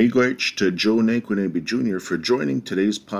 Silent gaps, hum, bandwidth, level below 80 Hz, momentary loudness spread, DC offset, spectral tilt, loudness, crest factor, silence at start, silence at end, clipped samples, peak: none; none; 15 kHz; -60 dBFS; 5 LU; under 0.1%; -5 dB/octave; -21 LUFS; 14 dB; 0 s; 0 s; under 0.1%; -6 dBFS